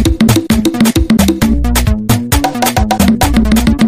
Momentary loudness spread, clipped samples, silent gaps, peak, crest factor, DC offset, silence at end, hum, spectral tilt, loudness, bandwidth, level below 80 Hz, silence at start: 3 LU; under 0.1%; none; 0 dBFS; 10 dB; under 0.1%; 0 s; none; -5 dB/octave; -11 LUFS; 16 kHz; -18 dBFS; 0 s